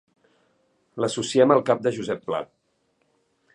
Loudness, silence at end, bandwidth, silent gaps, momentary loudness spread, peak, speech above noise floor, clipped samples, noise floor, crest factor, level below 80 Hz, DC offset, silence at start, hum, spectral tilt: -23 LUFS; 1.1 s; 11 kHz; none; 15 LU; -2 dBFS; 48 dB; under 0.1%; -70 dBFS; 22 dB; -68 dBFS; under 0.1%; 0.95 s; none; -5 dB/octave